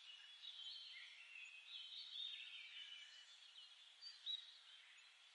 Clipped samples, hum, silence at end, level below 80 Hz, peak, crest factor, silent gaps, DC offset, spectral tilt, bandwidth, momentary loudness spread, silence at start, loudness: under 0.1%; none; 0 s; under -90 dBFS; -40 dBFS; 18 dB; none; under 0.1%; 6 dB/octave; 11 kHz; 13 LU; 0 s; -54 LUFS